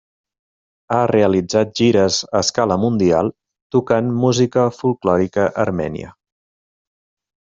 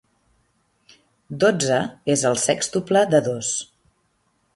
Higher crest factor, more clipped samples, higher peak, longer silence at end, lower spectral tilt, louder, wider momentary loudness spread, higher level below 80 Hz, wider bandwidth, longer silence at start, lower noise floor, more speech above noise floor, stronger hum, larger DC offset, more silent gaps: about the same, 18 dB vs 18 dB; neither; first, 0 dBFS vs -4 dBFS; first, 1.35 s vs 0.9 s; first, -5.5 dB/octave vs -4 dB/octave; first, -17 LUFS vs -20 LUFS; second, 6 LU vs 9 LU; first, -54 dBFS vs -62 dBFS; second, 7.8 kHz vs 11.5 kHz; second, 0.9 s vs 1.3 s; first, under -90 dBFS vs -67 dBFS; first, over 74 dB vs 47 dB; neither; neither; first, 3.62-3.70 s vs none